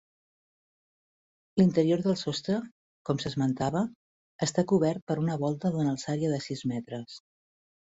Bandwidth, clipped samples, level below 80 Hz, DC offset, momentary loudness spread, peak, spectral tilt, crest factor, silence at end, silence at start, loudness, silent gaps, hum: 8 kHz; under 0.1%; -64 dBFS; under 0.1%; 12 LU; -12 dBFS; -6.5 dB/octave; 18 dB; 0.75 s; 1.55 s; -29 LUFS; 2.71-3.05 s, 3.95-4.39 s, 5.02-5.07 s; none